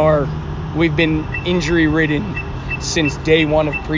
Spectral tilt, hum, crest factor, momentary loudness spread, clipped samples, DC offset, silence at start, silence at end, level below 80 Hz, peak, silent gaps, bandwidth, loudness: -5.5 dB/octave; none; 16 dB; 10 LU; under 0.1%; under 0.1%; 0 s; 0 s; -30 dBFS; -2 dBFS; none; 7.6 kHz; -17 LUFS